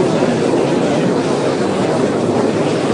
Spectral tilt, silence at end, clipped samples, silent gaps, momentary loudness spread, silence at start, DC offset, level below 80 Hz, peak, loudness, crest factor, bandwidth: -6 dB/octave; 0 s; under 0.1%; none; 2 LU; 0 s; under 0.1%; -52 dBFS; -2 dBFS; -15 LUFS; 12 dB; 11 kHz